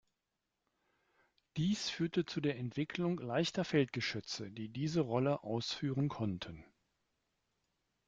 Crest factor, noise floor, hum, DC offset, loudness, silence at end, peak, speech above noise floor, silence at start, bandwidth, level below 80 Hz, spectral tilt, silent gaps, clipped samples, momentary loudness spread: 18 dB; -88 dBFS; none; under 0.1%; -37 LUFS; 1.45 s; -20 dBFS; 51 dB; 1.55 s; 9 kHz; -70 dBFS; -5.5 dB/octave; none; under 0.1%; 9 LU